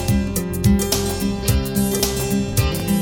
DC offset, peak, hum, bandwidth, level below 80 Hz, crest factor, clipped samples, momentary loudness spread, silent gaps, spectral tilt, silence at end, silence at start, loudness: under 0.1%; -4 dBFS; none; over 20 kHz; -28 dBFS; 16 dB; under 0.1%; 3 LU; none; -5 dB/octave; 0 s; 0 s; -20 LUFS